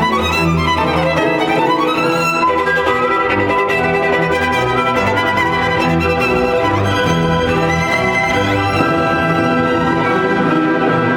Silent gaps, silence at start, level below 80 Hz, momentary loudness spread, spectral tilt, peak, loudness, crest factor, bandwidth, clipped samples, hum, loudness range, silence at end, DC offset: none; 0 s; -36 dBFS; 1 LU; -5.5 dB/octave; 0 dBFS; -14 LUFS; 14 dB; 18 kHz; under 0.1%; none; 0 LU; 0 s; under 0.1%